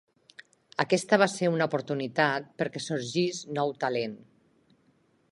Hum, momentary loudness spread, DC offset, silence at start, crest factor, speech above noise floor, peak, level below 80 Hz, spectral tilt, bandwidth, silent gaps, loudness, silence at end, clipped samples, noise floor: none; 9 LU; under 0.1%; 0.8 s; 24 dB; 39 dB; -6 dBFS; -76 dBFS; -4.5 dB/octave; 11.5 kHz; none; -28 LUFS; 1.15 s; under 0.1%; -67 dBFS